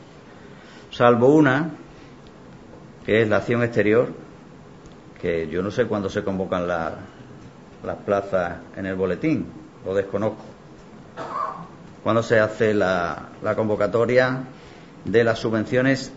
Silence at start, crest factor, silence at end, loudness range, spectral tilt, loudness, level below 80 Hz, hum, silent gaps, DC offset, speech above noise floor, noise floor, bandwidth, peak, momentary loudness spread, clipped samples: 0 s; 22 dB; 0 s; 6 LU; -7 dB/octave; -22 LUFS; -54 dBFS; none; none; 0.1%; 23 dB; -44 dBFS; 8 kHz; -2 dBFS; 20 LU; under 0.1%